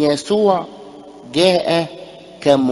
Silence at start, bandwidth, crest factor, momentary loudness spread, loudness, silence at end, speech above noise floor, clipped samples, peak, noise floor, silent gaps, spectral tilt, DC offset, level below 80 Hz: 0 s; 11.5 kHz; 18 dB; 22 LU; -17 LUFS; 0 s; 22 dB; under 0.1%; 0 dBFS; -37 dBFS; none; -5 dB/octave; under 0.1%; -56 dBFS